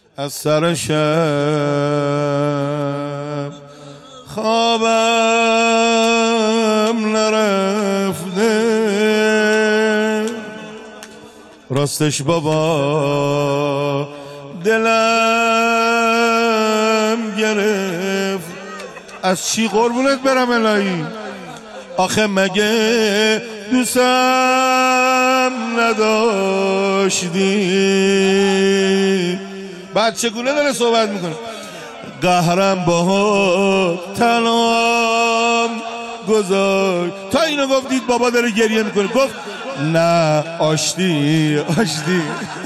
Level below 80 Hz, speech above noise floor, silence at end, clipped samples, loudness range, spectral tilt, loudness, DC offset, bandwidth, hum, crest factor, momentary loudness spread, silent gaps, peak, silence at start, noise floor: -58 dBFS; 25 dB; 0 s; under 0.1%; 4 LU; -4.5 dB/octave; -16 LUFS; under 0.1%; 15 kHz; none; 12 dB; 12 LU; none; -6 dBFS; 0.2 s; -41 dBFS